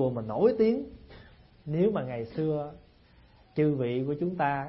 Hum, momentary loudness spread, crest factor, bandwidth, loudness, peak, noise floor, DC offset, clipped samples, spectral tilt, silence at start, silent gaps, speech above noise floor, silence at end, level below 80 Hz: none; 11 LU; 18 dB; 5.8 kHz; -29 LUFS; -12 dBFS; -58 dBFS; under 0.1%; under 0.1%; -11.5 dB/octave; 0 s; none; 30 dB; 0 s; -58 dBFS